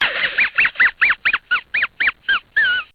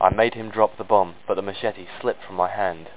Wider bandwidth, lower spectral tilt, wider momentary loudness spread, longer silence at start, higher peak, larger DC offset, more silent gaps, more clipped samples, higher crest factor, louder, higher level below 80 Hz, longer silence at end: first, 5.6 kHz vs 4 kHz; second, -2.5 dB/octave vs -9 dB/octave; about the same, 6 LU vs 8 LU; about the same, 0 s vs 0 s; second, -6 dBFS vs 0 dBFS; second, under 0.1% vs 0.8%; neither; neither; second, 14 dB vs 22 dB; first, -16 LUFS vs -24 LUFS; about the same, -52 dBFS vs -48 dBFS; about the same, 0.1 s vs 0.05 s